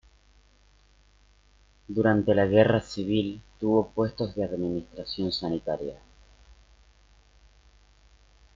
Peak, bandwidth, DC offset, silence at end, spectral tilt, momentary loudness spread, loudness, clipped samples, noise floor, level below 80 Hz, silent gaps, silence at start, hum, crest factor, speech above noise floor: -6 dBFS; 7.6 kHz; under 0.1%; 2.6 s; -7.5 dB/octave; 13 LU; -27 LUFS; under 0.1%; -60 dBFS; -54 dBFS; none; 1.9 s; 50 Hz at -50 dBFS; 22 dB; 34 dB